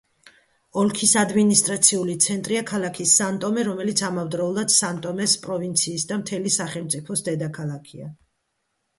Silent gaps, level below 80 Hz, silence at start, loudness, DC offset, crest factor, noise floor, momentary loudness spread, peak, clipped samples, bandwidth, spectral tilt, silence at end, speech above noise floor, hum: none; -64 dBFS; 0.75 s; -21 LUFS; under 0.1%; 22 dB; -75 dBFS; 11 LU; -2 dBFS; under 0.1%; 12 kHz; -3 dB/octave; 0.85 s; 52 dB; none